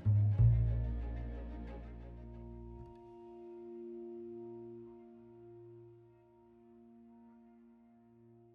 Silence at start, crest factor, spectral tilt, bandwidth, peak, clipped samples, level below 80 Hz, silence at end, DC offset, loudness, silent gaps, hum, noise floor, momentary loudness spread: 0 s; 20 dB; -11 dB/octave; 3 kHz; -18 dBFS; under 0.1%; -46 dBFS; 1.05 s; under 0.1%; -37 LUFS; none; none; -63 dBFS; 29 LU